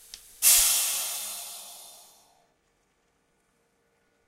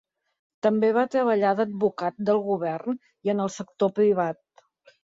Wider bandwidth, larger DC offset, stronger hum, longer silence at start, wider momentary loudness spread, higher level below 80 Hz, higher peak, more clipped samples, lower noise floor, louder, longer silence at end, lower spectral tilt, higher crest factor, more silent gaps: first, 16 kHz vs 7.8 kHz; neither; neither; second, 0.15 s vs 0.65 s; first, 26 LU vs 8 LU; first, -60 dBFS vs -70 dBFS; about the same, -6 dBFS vs -8 dBFS; neither; first, -71 dBFS vs -58 dBFS; first, -21 LUFS vs -25 LUFS; first, 2.35 s vs 0.7 s; second, 3.5 dB/octave vs -6.5 dB/octave; first, 24 dB vs 16 dB; neither